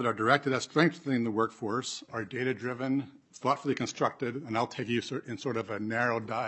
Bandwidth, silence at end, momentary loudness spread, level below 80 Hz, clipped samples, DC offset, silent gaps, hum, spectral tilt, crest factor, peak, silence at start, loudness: 8.6 kHz; 0 s; 9 LU; -76 dBFS; under 0.1%; under 0.1%; none; none; -5 dB/octave; 24 dB; -8 dBFS; 0 s; -31 LUFS